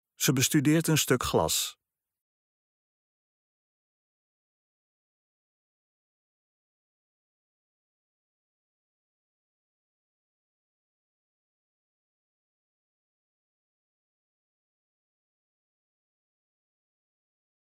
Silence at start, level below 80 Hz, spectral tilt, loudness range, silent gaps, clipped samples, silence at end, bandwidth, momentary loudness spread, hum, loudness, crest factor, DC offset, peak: 0.2 s; -62 dBFS; -4 dB/octave; 9 LU; none; under 0.1%; 15.95 s; 16 kHz; 4 LU; none; -25 LUFS; 26 dB; under 0.1%; -10 dBFS